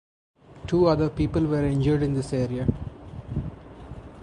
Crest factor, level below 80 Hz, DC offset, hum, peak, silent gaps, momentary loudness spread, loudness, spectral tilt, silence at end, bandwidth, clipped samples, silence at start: 18 dB; -40 dBFS; under 0.1%; none; -8 dBFS; none; 20 LU; -25 LUFS; -8.5 dB/octave; 0 s; 10.5 kHz; under 0.1%; 0.5 s